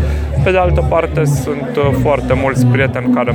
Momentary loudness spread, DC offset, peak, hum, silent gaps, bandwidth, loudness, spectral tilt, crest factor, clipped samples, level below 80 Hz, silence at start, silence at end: 3 LU; under 0.1%; 0 dBFS; none; none; 19.5 kHz; -14 LUFS; -7 dB/octave; 12 dB; under 0.1%; -22 dBFS; 0 s; 0 s